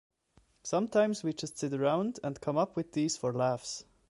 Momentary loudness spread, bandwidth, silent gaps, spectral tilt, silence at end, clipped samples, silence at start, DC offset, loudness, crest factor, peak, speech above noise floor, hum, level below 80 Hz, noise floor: 8 LU; 11.5 kHz; none; -5 dB/octave; 0.25 s; under 0.1%; 0.65 s; under 0.1%; -32 LUFS; 18 dB; -16 dBFS; 36 dB; none; -70 dBFS; -68 dBFS